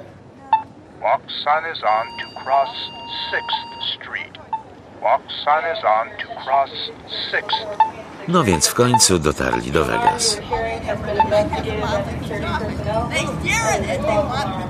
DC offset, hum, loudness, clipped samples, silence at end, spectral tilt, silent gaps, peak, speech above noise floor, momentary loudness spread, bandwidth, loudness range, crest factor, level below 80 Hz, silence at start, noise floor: under 0.1%; none; -20 LUFS; under 0.1%; 0 s; -3.5 dB/octave; none; 0 dBFS; 21 dB; 11 LU; 14.5 kHz; 6 LU; 20 dB; -40 dBFS; 0 s; -41 dBFS